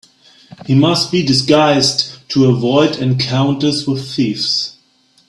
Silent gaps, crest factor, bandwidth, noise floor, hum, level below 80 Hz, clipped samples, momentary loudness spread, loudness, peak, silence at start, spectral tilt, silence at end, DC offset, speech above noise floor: none; 14 dB; 12 kHz; -54 dBFS; none; -52 dBFS; under 0.1%; 7 LU; -14 LUFS; 0 dBFS; 0.6 s; -5 dB/octave; 0.6 s; under 0.1%; 41 dB